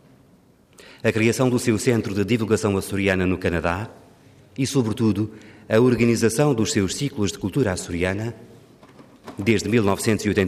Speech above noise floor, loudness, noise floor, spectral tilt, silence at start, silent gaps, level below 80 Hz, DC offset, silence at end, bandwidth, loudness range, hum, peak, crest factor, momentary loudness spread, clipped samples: 34 dB; -22 LUFS; -55 dBFS; -5.5 dB/octave; 0.8 s; none; -52 dBFS; under 0.1%; 0 s; 15.5 kHz; 3 LU; none; -6 dBFS; 16 dB; 8 LU; under 0.1%